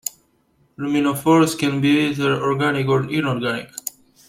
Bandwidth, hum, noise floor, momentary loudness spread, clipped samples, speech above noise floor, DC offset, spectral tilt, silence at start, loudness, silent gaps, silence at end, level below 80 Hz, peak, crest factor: 16.5 kHz; none; -61 dBFS; 14 LU; under 0.1%; 43 dB; under 0.1%; -5.5 dB/octave; 0.05 s; -19 LUFS; none; 0.4 s; -58 dBFS; -4 dBFS; 16 dB